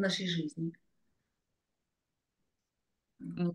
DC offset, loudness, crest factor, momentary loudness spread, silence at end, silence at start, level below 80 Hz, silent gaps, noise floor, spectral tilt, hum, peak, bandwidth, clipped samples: under 0.1%; -36 LUFS; 22 dB; 13 LU; 0 s; 0 s; -80 dBFS; none; -87 dBFS; -5.5 dB/octave; none; -18 dBFS; 10 kHz; under 0.1%